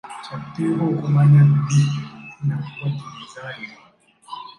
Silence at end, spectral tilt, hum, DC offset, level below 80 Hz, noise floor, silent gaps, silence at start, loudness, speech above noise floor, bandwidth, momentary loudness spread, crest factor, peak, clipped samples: 0.05 s; -7.5 dB/octave; none; under 0.1%; -60 dBFS; -41 dBFS; none; 0.05 s; -19 LUFS; 23 dB; 9.8 kHz; 22 LU; 14 dB; -6 dBFS; under 0.1%